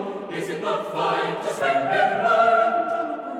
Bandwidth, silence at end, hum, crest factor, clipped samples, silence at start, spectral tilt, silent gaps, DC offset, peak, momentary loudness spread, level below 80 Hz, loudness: 13.5 kHz; 0 s; none; 16 dB; under 0.1%; 0 s; -4.5 dB/octave; none; under 0.1%; -6 dBFS; 10 LU; -72 dBFS; -22 LUFS